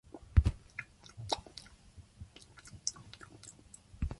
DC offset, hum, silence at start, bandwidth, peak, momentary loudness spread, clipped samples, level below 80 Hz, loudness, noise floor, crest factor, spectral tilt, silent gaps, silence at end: under 0.1%; none; 0.15 s; 11.5 kHz; -12 dBFS; 25 LU; under 0.1%; -40 dBFS; -36 LUFS; -58 dBFS; 26 dB; -4.5 dB/octave; none; 0.05 s